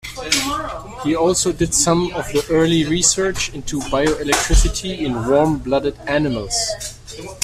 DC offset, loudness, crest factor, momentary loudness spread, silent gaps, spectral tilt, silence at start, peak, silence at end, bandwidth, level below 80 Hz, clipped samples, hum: under 0.1%; -18 LUFS; 16 dB; 10 LU; none; -3.5 dB/octave; 0.05 s; -2 dBFS; 0 s; 15.5 kHz; -28 dBFS; under 0.1%; none